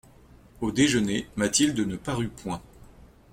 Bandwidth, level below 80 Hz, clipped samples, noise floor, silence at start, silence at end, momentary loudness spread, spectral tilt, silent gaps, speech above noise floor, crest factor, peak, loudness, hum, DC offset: 16.5 kHz; -50 dBFS; under 0.1%; -53 dBFS; 0.6 s; 0.3 s; 13 LU; -4 dB/octave; none; 27 dB; 18 dB; -8 dBFS; -26 LUFS; none; under 0.1%